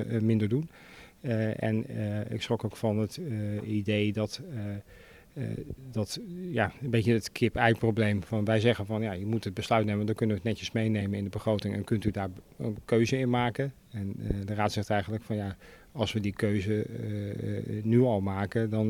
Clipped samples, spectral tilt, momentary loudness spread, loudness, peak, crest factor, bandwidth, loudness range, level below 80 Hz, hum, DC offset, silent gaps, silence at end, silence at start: under 0.1%; -7 dB/octave; 11 LU; -30 LUFS; -8 dBFS; 22 dB; 15.5 kHz; 5 LU; -54 dBFS; none; under 0.1%; none; 0 s; 0 s